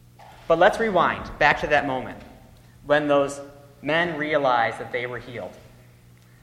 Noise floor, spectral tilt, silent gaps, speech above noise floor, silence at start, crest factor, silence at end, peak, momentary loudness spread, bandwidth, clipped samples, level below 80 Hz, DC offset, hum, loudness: -51 dBFS; -5 dB/octave; none; 29 dB; 0.2 s; 20 dB; 0.8 s; -4 dBFS; 18 LU; 15 kHz; under 0.1%; -50 dBFS; under 0.1%; none; -22 LUFS